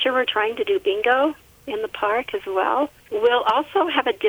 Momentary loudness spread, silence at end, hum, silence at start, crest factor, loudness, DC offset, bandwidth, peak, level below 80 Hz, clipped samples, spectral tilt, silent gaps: 8 LU; 0 s; none; 0 s; 16 dB; -21 LUFS; under 0.1%; over 20 kHz; -6 dBFS; -60 dBFS; under 0.1%; -4 dB/octave; none